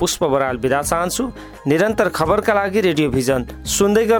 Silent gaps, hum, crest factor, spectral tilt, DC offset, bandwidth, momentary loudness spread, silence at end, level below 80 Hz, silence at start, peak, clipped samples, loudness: none; none; 14 dB; -4.5 dB/octave; under 0.1%; over 20 kHz; 6 LU; 0 s; -38 dBFS; 0 s; -4 dBFS; under 0.1%; -18 LUFS